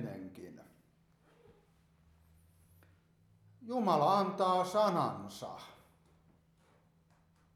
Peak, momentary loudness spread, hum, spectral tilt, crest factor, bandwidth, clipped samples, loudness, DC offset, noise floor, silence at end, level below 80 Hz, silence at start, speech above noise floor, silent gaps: -18 dBFS; 23 LU; none; -6 dB/octave; 20 dB; 15.5 kHz; under 0.1%; -33 LUFS; under 0.1%; -69 dBFS; 1.85 s; -76 dBFS; 0 s; 37 dB; none